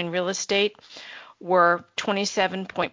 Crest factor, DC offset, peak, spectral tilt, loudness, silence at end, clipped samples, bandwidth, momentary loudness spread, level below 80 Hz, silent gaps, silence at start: 20 dB; under 0.1%; -6 dBFS; -3.5 dB/octave; -23 LUFS; 0.05 s; under 0.1%; 7.6 kHz; 20 LU; -66 dBFS; none; 0 s